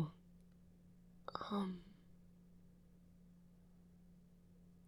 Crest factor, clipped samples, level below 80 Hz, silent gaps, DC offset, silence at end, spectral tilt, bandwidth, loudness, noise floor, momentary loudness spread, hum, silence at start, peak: 26 dB; under 0.1%; -70 dBFS; none; under 0.1%; 0 s; -7.5 dB/octave; 13 kHz; -46 LUFS; -65 dBFS; 24 LU; none; 0 s; -24 dBFS